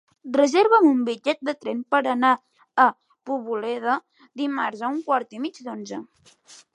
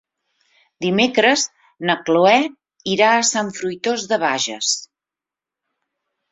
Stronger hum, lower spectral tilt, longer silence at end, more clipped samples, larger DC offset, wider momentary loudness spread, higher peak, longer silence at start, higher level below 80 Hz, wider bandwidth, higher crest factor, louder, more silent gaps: neither; first, -4 dB/octave vs -2.5 dB/octave; second, 0.2 s vs 1.5 s; neither; neither; first, 16 LU vs 11 LU; second, -4 dBFS vs 0 dBFS; second, 0.25 s vs 0.8 s; second, -80 dBFS vs -66 dBFS; first, 11 kHz vs 8.4 kHz; about the same, 20 dB vs 20 dB; second, -23 LUFS vs -18 LUFS; neither